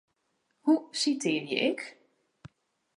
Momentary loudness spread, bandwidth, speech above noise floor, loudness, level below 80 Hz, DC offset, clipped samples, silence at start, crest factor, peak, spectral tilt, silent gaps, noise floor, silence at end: 9 LU; 11.5 kHz; 47 dB; -29 LUFS; -76 dBFS; under 0.1%; under 0.1%; 0.65 s; 20 dB; -12 dBFS; -3.5 dB/octave; none; -76 dBFS; 0.5 s